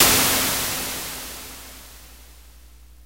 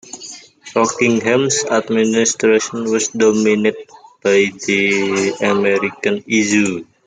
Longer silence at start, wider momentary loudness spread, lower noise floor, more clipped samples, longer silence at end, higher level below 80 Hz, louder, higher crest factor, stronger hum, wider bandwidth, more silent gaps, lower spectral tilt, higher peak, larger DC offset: about the same, 0 s vs 0.05 s; first, 24 LU vs 7 LU; first, -47 dBFS vs -36 dBFS; neither; about the same, 0.2 s vs 0.25 s; first, -44 dBFS vs -62 dBFS; second, -21 LUFS vs -15 LUFS; first, 22 dB vs 14 dB; first, 60 Hz at -50 dBFS vs none; first, 16 kHz vs 9.6 kHz; neither; second, -1 dB/octave vs -3.5 dB/octave; about the same, -2 dBFS vs -2 dBFS; first, 0.2% vs under 0.1%